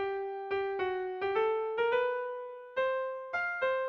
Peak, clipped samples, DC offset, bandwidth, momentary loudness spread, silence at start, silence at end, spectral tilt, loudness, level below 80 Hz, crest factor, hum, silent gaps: -20 dBFS; under 0.1%; under 0.1%; 6.4 kHz; 7 LU; 0 s; 0 s; -5 dB/octave; -33 LUFS; -70 dBFS; 14 dB; none; none